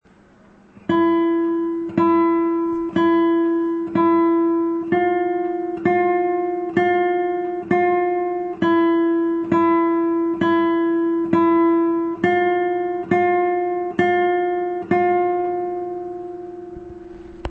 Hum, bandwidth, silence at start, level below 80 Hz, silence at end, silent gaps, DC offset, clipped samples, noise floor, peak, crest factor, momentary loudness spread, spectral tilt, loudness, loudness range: none; 4.3 kHz; 0.9 s; -52 dBFS; 0 s; none; under 0.1%; under 0.1%; -50 dBFS; -4 dBFS; 16 dB; 9 LU; -8.5 dB/octave; -19 LUFS; 2 LU